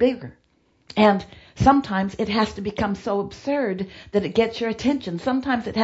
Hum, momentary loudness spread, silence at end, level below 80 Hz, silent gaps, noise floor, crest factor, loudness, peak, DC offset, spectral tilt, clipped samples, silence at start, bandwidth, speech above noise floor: none; 9 LU; 0 s; -46 dBFS; none; -63 dBFS; 20 dB; -23 LUFS; -2 dBFS; under 0.1%; -6.5 dB/octave; under 0.1%; 0 s; 8 kHz; 41 dB